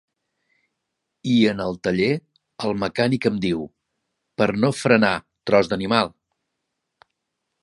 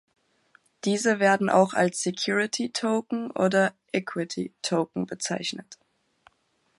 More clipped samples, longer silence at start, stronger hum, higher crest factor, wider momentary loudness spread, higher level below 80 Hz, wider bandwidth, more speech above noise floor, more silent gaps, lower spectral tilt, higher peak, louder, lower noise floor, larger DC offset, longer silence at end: neither; first, 1.25 s vs 0.85 s; neither; about the same, 22 dB vs 20 dB; about the same, 11 LU vs 10 LU; first, -56 dBFS vs -74 dBFS; about the same, 11.5 kHz vs 11.5 kHz; first, 59 dB vs 45 dB; neither; first, -6 dB/octave vs -4 dB/octave; first, -2 dBFS vs -6 dBFS; first, -21 LUFS vs -26 LUFS; first, -79 dBFS vs -70 dBFS; neither; first, 1.55 s vs 1.05 s